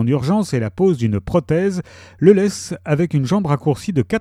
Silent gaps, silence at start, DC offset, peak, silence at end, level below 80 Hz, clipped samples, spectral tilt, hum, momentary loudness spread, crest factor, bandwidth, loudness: none; 0 s; under 0.1%; 0 dBFS; 0 s; -46 dBFS; under 0.1%; -7 dB/octave; none; 8 LU; 18 dB; 14 kHz; -18 LUFS